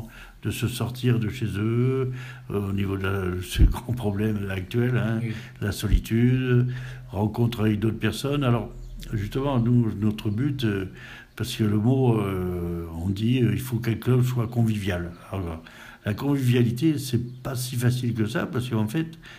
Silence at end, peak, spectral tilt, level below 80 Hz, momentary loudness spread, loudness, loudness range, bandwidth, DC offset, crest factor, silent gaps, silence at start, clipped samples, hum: 0 s; -6 dBFS; -7 dB/octave; -36 dBFS; 11 LU; -25 LUFS; 2 LU; 15.5 kHz; under 0.1%; 18 dB; none; 0 s; under 0.1%; none